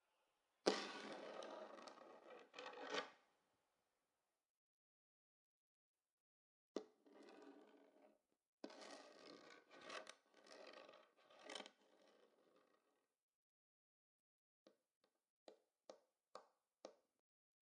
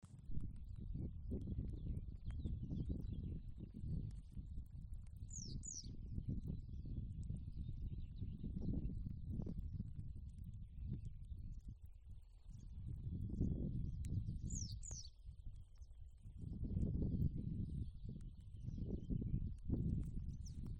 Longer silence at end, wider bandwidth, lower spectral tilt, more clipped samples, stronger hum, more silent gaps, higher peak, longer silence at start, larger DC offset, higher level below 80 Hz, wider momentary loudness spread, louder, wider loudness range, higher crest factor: first, 0.8 s vs 0 s; about the same, 10.5 kHz vs 9.8 kHz; second, -2.5 dB/octave vs -7 dB/octave; neither; neither; first, 4.50-5.94 s, 6.12-6.75 s, 8.47-8.58 s, 13.22-14.66 s, 14.96-15.01 s, 15.30-15.46 s vs none; first, -22 dBFS vs -26 dBFS; first, 0.65 s vs 0.05 s; neither; second, under -90 dBFS vs -50 dBFS; first, 18 LU vs 13 LU; second, -53 LUFS vs -48 LUFS; first, 14 LU vs 5 LU; first, 38 dB vs 20 dB